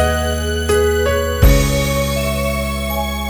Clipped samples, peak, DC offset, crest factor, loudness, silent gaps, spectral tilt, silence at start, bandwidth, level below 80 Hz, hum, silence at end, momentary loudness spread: under 0.1%; -2 dBFS; under 0.1%; 14 dB; -16 LUFS; none; -5 dB/octave; 0 s; over 20 kHz; -20 dBFS; none; 0 s; 7 LU